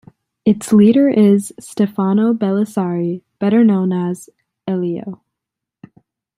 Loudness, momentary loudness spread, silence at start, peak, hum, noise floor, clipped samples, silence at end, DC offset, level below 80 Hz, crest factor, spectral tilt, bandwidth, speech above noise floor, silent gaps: -15 LUFS; 13 LU; 0.45 s; -2 dBFS; none; -82 dBFS; under 0.1%; 1.25 s; under 0.1%; -60 dBFS; 14 dB; -7.5 dB/octave; 14.5 kHz; 68 dB; none